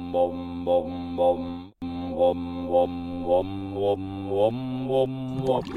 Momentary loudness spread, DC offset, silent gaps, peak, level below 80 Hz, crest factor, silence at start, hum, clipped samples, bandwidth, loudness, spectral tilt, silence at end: 8 LU; under 0.1%; none; -10 dBFS; -52 dBFS; 16 dB; 0 s; none; under 0.1%; 10 kHz; -26 LUFS; -8.5 dB/octave; 0 s